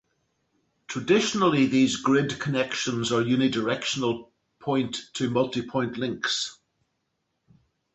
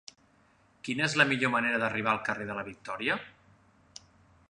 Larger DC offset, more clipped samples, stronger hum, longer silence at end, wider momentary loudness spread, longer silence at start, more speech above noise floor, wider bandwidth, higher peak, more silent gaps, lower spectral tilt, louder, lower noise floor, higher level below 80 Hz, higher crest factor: neither; neither; neither; first, 1.4 s vs 1.2 s; second, 9 LU vs 13 LU; about the same, 0.9 s vs 0.85 s; first, 53 dB vs 35 dB; second, 8.2 kHz vs 11 kHz; second, -10 dBFS vs -6 dBFS; neither; about the same, -4.5 dB/octave vs -4 dB/octave; first, -25 LUFS vs -29 LUFS; first, -77 dBFS vs -65 dBFS; about the same, -64 dBFS vs -68 dBFS; second, 18 dB vs 26 dB